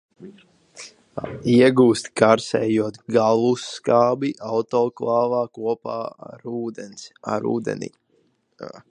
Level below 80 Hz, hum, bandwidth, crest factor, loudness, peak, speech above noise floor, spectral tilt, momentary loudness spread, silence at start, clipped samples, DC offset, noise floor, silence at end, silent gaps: -62 dBFS; none; 11 kHz; 22 dB; -21 LUFS; 0 dBFS; 44 dB; -6 dB/octave; 20 LU; 0.2 s; under 0.1%; under 0.1%; -64 dBFS; 0.1 s; none